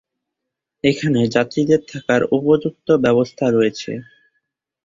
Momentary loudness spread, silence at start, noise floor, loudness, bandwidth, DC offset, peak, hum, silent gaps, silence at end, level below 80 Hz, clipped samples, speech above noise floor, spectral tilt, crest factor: 5 LU; 0.85 s; -81 dBFS; -18 LUFS; 7.6 kHz; under 0.1%; -2 dBFS; none; none; 0.8 s; -56 dBFS; under 0.1%; 64 dB; -6.5 dB/octave; 16 dB